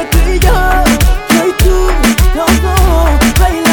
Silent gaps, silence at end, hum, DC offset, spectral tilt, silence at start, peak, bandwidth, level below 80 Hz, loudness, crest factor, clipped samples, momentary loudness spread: none; 0 s; none; under 0.1%; -5 dB/octave; 0 s; 0 dBFS; 19.5 kHz; -10 dBFS; -10 LUFS; 8 dB; under 0.1%; 1 LU